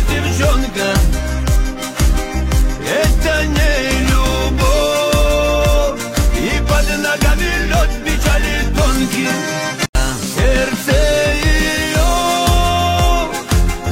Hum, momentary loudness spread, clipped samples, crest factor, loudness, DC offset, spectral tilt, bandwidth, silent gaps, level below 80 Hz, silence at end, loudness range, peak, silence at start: none; 4 LU; under 0.1%; 14 dB; -15 LUFS; under 0.1%; -4.5 dB/octave; 16.5 kHz; 9.89-9.93 s; -16 dBFS; 0 s; 2 LU; 0 dBFS; 0 s